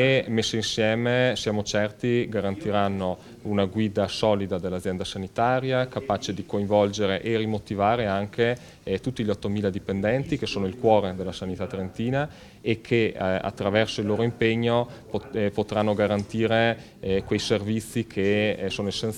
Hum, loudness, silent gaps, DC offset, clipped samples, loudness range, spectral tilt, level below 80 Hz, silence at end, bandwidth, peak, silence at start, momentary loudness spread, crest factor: none; -25 LUFS; none; under 0.1%; under 0.1%; 2 LU; -5.5 dB/octave; -52 dBFS; 0 s; 14.5 kHz; -6 dBFS; 0 s; 8 LU; 20 dB